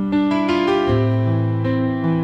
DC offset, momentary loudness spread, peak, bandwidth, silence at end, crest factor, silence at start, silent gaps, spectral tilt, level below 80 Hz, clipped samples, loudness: under 0.1%; 3 LU; -8 dBFS; 7.8 kHz; 0 s; 10 dB; 0 s; none; -8.5 dB/octave; -44 dBFS; under 0.1%; -19 LUFS